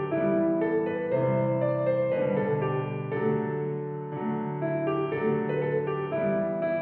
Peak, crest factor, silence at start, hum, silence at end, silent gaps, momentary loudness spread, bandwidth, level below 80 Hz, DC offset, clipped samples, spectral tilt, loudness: -14 dBFS; 14 dB; 0 s; none; 0 s; none; 6 LU; 4.3 kHz; -66 dBFS; under 0.1%; under 0.1%; -8 dB/octave; -28 LUFS